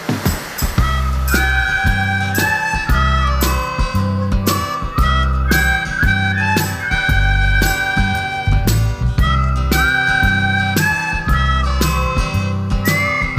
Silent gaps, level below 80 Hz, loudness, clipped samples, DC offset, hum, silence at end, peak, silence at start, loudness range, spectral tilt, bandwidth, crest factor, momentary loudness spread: none; -20 dBFS; -16 LUFS; under 0.1%; under 0.1%; none; 0 s; 0 dBFS; 0 s; 1 LU; -4.5 dB/octave; 15.5 kHz; 16 dB; 4 LU